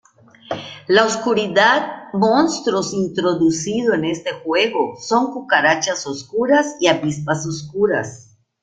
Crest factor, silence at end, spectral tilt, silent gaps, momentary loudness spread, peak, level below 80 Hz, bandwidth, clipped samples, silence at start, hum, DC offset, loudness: 18 dB; 0.4 s; -4 dB/octave; none; 10 LU; 0 dBFS; -58 dBFS; 9.4 kHz; under 0.1%; 0.5 s; none; under 0.1%; -18 LUFS